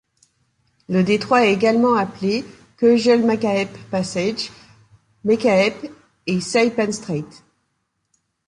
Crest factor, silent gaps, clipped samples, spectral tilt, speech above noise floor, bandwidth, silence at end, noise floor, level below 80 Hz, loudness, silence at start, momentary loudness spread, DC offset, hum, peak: 18 dB; none; under 0.1%; -5.5 dB/octave; 54 dB; 11 kHz; 1.25 s; -72 dBFS; -58 dBFS; -19 LUFS; 0.9 s; 13 LU; under 0.1%; none; -4 dBFS